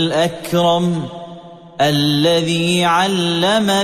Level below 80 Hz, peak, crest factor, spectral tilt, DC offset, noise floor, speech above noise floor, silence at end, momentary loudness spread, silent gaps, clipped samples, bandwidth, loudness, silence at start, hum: -54 dBFS; -4 dBFS; 12 dB; -5 dB/octave; under 0.1%; -36 dBFS; 21 dB; 0 s; 14 LU; none; under 0.1%; 15 kHz; -15 LUFS; 0 s; none